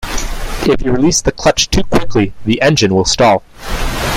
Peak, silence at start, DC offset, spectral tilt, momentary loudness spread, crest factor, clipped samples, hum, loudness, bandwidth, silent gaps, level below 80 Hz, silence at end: 0 dBFS; 0 s; under 0.1%; -4 dB/octave; 11 LU; 12 dB; under 0.1%; none; -13 LUFS; 16.5 kHz; none; -24 dBFS; 0 s